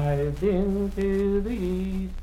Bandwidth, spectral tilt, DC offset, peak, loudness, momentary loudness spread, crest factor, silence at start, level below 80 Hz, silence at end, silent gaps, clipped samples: 14 kHz; -8.5 dB/octave; under 0.1%; -12 dBFS; -26 LUFS; 4 LU; 12 dB; 0 s; -34 dBFS; 0 s; none; under 0.1%